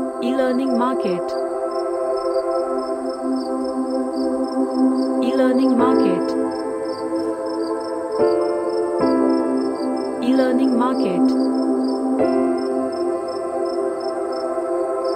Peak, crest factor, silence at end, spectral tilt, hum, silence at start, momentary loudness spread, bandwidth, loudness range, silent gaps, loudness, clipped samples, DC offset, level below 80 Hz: -4 dBFS; 14 dB; 0 s; -6 dB/octave; none; 0 s; 7 LU; 9.6 kHz; 3 LU; none; -20 LUFS; under 0.1%; under 0.1%; -60 dBFS